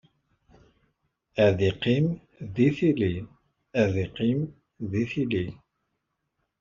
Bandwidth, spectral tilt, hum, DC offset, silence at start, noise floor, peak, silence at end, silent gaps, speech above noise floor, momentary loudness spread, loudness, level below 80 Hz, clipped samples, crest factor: 7.4 kHz; -6.5 dB/octave; none; under 0.1%; 1.35 s; -79 dBFS; -8 dBFS; 1.05 s; none; 55 dB; 14 LU; -26 LUFS; -56 dBFS; under 0.1%; 20 dB